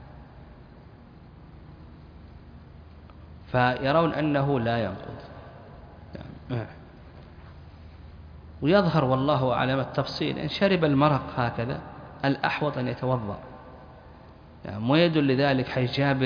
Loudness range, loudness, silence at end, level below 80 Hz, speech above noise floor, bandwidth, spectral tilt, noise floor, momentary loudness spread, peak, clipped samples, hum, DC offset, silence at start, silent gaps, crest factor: 10 LU; -25 LUFS; 0 s; -50 dBFS; 24 dB; 5.2 kHz; -8 dB/octave; -48 dBFS; 25 LU; -8 dBFS; under 0.1%; none; under 0.1%; 0 s; none; 20 dB